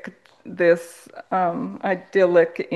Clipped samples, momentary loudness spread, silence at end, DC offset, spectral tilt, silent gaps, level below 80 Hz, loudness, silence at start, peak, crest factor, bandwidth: under 0.1%; 22 LU; 0 s; under 0.1%; -6.5 dB/octave; none; -72 dBFS; -21 LUFS; 0.05 s; -4 dBFS; 18 dB; 12.5 kHz